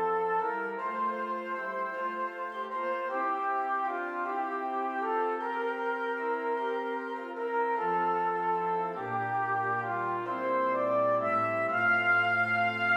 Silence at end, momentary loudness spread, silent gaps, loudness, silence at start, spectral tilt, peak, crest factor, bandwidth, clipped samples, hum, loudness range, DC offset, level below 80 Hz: 0 s; 8 LU; none; -30 LUFS; 0 s; -6.5 dB/octave; -16 dBFS; 14 dB; 9.6 kHz; under 0.1%; none; 5 LU; under 0.1%; -82 dBFS